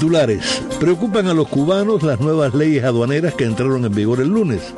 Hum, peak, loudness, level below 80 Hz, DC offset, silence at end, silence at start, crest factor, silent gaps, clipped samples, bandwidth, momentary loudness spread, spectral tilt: none; -6 dBFS; -17 LUFS; -46 dBFS; under 0.1%; 0 s; 0 s; 10 dB; none; under 0.1%; 11 kHz; 2 LU; -6.5 dB/octave